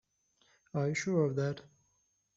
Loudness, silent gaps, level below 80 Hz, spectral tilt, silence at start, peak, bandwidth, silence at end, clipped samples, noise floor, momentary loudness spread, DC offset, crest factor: -33 LUFS; none; -74 dBFS; -7 dB/octave; 0.75 s; -18 dBFS; 7.8 kHz; 0.75 s; under 0.1%; -77 dBFS; 10 LU; under 0.1%; 18 dB